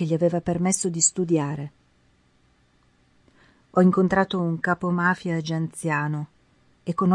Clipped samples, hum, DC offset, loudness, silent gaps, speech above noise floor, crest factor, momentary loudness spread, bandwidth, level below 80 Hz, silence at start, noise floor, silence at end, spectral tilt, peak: under 0.1%; none; under 0.1%; -23 LUFS; none; 39 dB; 18 dB; 11 LU; 11.5 kHz; -58 dBFS; 0 s; -62 dBFS; 0 s; -5 dB/octave; -6 dBFS